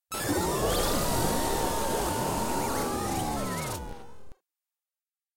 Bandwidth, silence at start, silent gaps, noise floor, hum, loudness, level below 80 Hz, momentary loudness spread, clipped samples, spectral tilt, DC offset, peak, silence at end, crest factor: 16.5 kHz; 0.1 s; none; under -90 dBFS; none; -29 LUFS; -40 dBFS; 7 LU; under 0.1%; -4 dB/octave; under 0.1%; -14 dBFS; 1 s; 16 dB